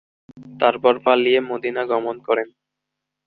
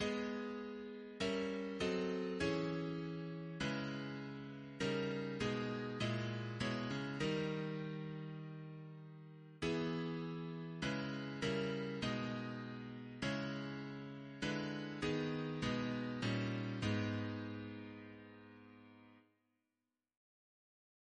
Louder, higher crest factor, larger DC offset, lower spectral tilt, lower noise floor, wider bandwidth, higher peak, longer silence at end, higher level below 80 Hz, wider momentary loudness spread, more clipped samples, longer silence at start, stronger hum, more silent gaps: first, -19 LUFS vs -42 LUFS; about the same, 20 dB vs 16 dB; neither; first, -7.5 dB/octave vs -6 dB/octave; second, -82 dBFS vs under -90 dBFS; second, 4.7 kHz vs 10 kHz; first, -2 dBFS vs -26 dBFS; second, 0.8 s vs 1.95 s; about the same, -66 dBFS vs -66 dBFS; second, 8 LU vs 12 LU; neither; first, 0.35 s vs 0 s; neither; neither